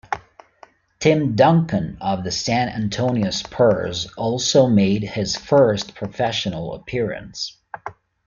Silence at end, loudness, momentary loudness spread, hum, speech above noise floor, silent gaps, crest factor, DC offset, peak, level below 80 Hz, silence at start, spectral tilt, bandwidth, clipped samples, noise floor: 0.35 s; -20 LUFS; 14 LU; none; 32 dB; none; 18 dB; under 0.1%; -2 dBFS; -50 dBFS; 0.1 s; -5.5 dB/octave; 7.4 kHz; under 0.1%; -51 dBFS